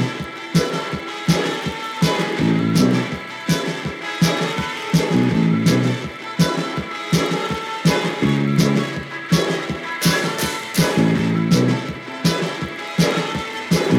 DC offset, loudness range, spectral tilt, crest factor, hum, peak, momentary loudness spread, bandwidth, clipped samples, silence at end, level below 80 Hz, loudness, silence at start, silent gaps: under 0.1%; 1 LU; -5.5 dB/octave; 16 dB; none; -4 dBFS; 9 LU; 17 kHz; under 0.1%; 0 s; -46 dBFS; -20 LUFS; 0 s; none